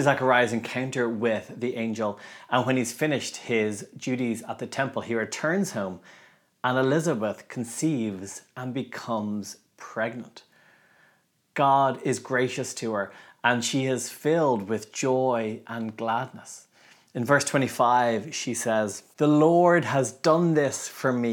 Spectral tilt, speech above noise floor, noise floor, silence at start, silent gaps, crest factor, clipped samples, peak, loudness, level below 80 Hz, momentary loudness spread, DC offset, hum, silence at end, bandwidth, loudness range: -5 dB/octave; 40 dB; -65 dBFS; 0 s; none; 20 dB; under 0.1%; -6 dBFS; -26 LUFS; -80 dBFS; 13 LU; under 0.1%; none; 0 s; 19 kHz; 7 LU